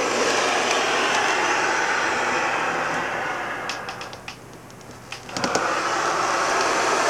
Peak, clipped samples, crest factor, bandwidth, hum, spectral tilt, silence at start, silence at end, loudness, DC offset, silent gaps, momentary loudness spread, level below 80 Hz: -4 dBFS; under 0.1%; 20 dB; 17.5 kHz; none; -1.5 dB/octave; 0 s; 0 s; -22 LUFS; under 0.1%; none; 17 LU; -58 dBFS